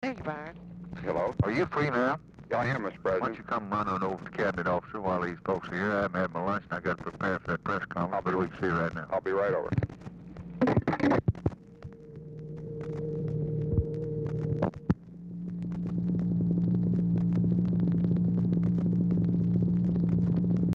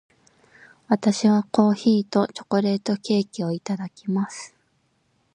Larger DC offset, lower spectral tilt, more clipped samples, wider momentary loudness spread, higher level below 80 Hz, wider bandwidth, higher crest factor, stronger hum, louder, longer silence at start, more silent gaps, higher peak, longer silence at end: neither; first, -9 dB/octave vs -6 dB/octave; neither; about the same, 12 LU vs 10 LU; first, -50 dBFS vs -68 dBFS; second, 6.4 kHz vs 10 kHz; about the same, 18 dB vs 18 dB; neither; second, -30 LUFS vs -23 LUFS; second, 0 s vs 0.9 s; neither; second, -12 dBFS vs -4 dBFS; second, 0 s vs 0.85 s